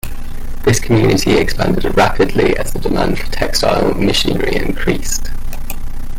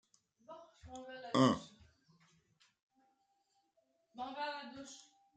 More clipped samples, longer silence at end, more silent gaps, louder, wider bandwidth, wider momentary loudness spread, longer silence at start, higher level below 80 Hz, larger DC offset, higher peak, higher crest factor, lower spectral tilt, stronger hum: neither; second, 0 s vs 0.35 s; second, none vs 2.82-2.90 s; first, -15 LUFS vs -37 LUFS; first, 16.5 kHz vs 9 kHz; second, 15 LU vs 25 LU; second, 0.05 s vs 0.5 s; first, -20 dBFS vs -74 dBFS; neither; first, -2 dBFS vs -16 dBFS; second, 12 dB vs 26 dB; about the same, -4.5 dB/octave vs -5.5 dB/octave; neither